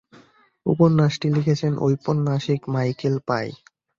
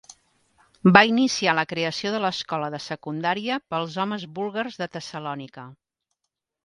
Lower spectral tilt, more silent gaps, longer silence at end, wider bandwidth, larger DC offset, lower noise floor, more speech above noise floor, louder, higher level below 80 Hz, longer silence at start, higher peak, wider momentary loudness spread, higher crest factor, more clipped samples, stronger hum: first, -7.5 dB/octave vs -5 dB/octave; neither; second, 0.45 s vs 0.9 s; second, 7.2 kHz vs 11 kHz; neither; second, -54 dBFS vs -82 dBFS; second, 34 dB vs 58 dB; about the same, -22 LUFS vs -23 LUFS; first, -58 dBFS vs -64 dBFS; second, 0.65 s vs 0.85 s; second, -4 dBFS vs 0 dBFS; second, 8 LU vs 17 LU; second, 18 dB vs 24 dB; neither; neither